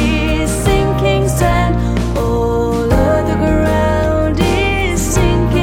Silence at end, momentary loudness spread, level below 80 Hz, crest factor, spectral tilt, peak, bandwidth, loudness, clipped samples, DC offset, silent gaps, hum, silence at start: 0 s; 2 LU; -20 dBFS; 12 dB; -6 dB/octave; 0 dBFS; 16.5 kHz; -14 LUFS; under 0.1%; under 0.1%; none; none; 0 s